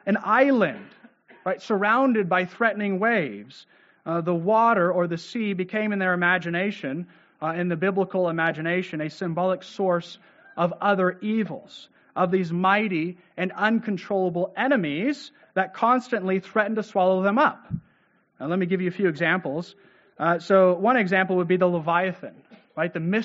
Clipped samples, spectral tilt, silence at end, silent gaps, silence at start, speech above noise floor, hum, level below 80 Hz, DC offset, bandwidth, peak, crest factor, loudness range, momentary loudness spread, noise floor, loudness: under 0.1%; -5 dB/octave; 0 s; none; 0.05 s; 40 dB; none; -68 dBFS; under 0.1%; 7.6 kHz; -6 dBFS; 18 dB; 3 LU; 12 LU; -64 dBFS; -24 LUFS